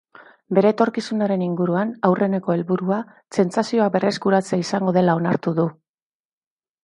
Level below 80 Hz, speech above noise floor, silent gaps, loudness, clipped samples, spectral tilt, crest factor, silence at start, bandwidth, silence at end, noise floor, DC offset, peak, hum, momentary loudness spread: -66 dBFS; over 70 dB; none; -21 LUFS; under 0.1%; -7 dB/octave; 18 dB; 0.2 s; 11 kHz; 1.1 s; under -90 dBFS; under 0.1%; -2 dBFS; none; 5 LU